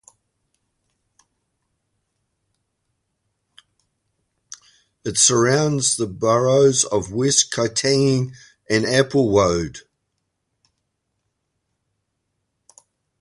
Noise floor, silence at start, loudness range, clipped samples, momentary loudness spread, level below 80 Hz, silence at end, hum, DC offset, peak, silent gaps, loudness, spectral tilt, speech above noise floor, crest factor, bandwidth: -75 dBFS; 5.05 s; 7 LU; under 0.1%; 9 LU; -50 dBFS; 3.4 s; none; under 0.1%; -2 dBFS; none; -18 LUFS; -3.5 dB/octave; 57 dB; 22 dB; 11.5 kHz